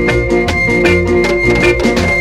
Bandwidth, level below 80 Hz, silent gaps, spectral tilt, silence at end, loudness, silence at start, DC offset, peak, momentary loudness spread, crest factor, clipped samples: 13 kHz; -24 dBFS; none; -5.5 dB/octave; 0 s; -11 LUFS; 0 s; under 0.1%; 0 dBFS; 2 LU; 12 dB; under 0.1%